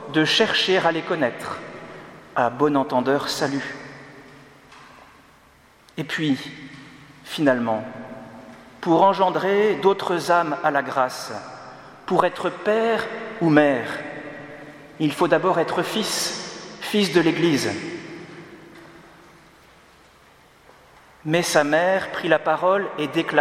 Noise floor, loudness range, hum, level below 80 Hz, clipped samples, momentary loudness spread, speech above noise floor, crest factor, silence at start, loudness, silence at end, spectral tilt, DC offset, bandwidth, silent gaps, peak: -53 dBFS; 9 LU; none; -64 dBFS; under 0.1%; 21 LU; 33 dB; 22 dB; 0 s; -21 LUFS; 0 s; -4.5 dB/octave; under 0.1%; 16.5 kHz; none; 0 dBFS